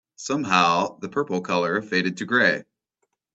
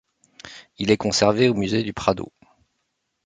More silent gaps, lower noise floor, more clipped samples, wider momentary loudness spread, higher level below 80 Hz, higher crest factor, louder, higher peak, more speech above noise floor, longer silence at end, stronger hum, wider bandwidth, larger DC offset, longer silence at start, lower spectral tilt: neither; about the same, -76 dBFS vs -75 dBFS; neither; second, 9 LU vs 23 LU; second, -66 dBFS vs -52 dBFS; about the same, 22 dB vs 22 dB; about the same, -22 LUFS vs -21 LUFS; about the same, -2 dBFS vs -2 dBFS; about the same, 53 dB vs 55 dB; second, 0.75 s vs 1 s; neither; second, 8.2 kHz vs 9.6 kHz; neither; second, 0.2 s vs 0.45 s; about the same, -4 dB/octave vs -4.5 dB/octave